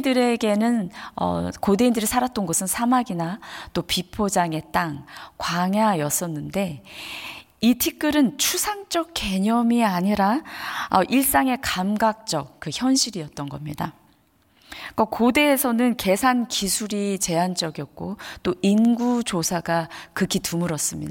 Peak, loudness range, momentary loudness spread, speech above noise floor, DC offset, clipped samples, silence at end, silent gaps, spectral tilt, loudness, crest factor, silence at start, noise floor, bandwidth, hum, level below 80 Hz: -4 dBFS; 3 LU; 13 LU; 38 dB; under 0.1%; under 0.1%; 0 s; none; -4 dB/octave; -22 LUFS; 18 dB; 0 s; -60 dBFS; 17 kHz; none; -52 dBFS